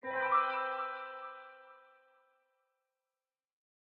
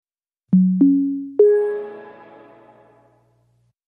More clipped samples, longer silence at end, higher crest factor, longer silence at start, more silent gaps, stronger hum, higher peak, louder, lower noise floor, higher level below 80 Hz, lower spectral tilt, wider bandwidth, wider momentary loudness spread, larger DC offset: neither; first, 2.2 s vs 1.75 s; about the same, 22 dB vs 18 dB; second, 0.05 s vs 0.5 s; neither; second, none vs 60 Hz at -60 dBFS; second, -18 dBFS vs -4 dBFS; second, -34 LUFS vs -17 LUFS; first, under -90 dBFS vs -63 dBFS; second, under -90 dBFS vs -74 dBFS; second, 1 dB/octave vs -12.5 dB/octave; first, 5.2 kHz vs 2.8 kHz; first, 20 LU vs 16 LU; neither